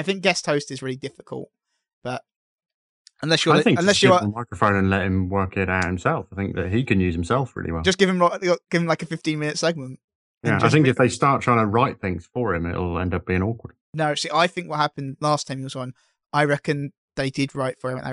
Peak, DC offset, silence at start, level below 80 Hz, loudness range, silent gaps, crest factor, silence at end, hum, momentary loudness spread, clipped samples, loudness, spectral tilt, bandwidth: -2 dBFS; under 0.1%; 0 s; -48 dBFS; 5 LU; 1.93-2.02 s, 2.36-2.58 s, 2.74-3.05 s, 10.04-10.08 s, 10.15-10.41 s, 13.81-13.93 s, 16.97-17.08 s; 20 dB; 0 s; none; 15 LU; under 0.1%; -22 LUFS; -5 dB/octave; 11.5 kHz